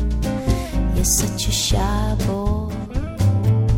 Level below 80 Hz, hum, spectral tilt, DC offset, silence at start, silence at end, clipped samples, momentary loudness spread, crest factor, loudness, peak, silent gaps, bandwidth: -24 dBFS; none; -4.5 dB/octave; under 0.1%; 0 s; 0 s; under 0.1%; 7 LU; 14 dB; -20 LUFS; -4 dBFS; none; 16.5 kHz